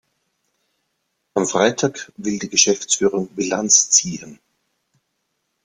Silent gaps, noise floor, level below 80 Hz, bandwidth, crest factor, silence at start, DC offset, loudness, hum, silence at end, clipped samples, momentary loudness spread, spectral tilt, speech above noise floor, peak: none; -73 dBFS; -62 dBFS; 11 kHz; 22 dB; 1.35 s; under 0.1%; -17 LUFS; none; 1.3 s; under 0.1%; 13 LU; -2 dB/octave; 54 dB; 0 dBFS